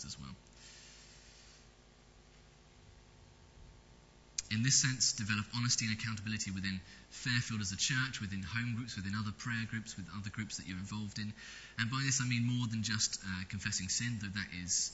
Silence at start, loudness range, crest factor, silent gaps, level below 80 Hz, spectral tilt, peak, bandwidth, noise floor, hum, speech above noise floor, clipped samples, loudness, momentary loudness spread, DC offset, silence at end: 0 s; 7 LU; 22 dB; none; -62 dBFS; -2.5 dB/octave; -16 dBFS; 8.2 kHz; -62 dBFS; none; 25 dB; under 0.1%; -36 LUFS; 17 LU; under 0.1%; 0 s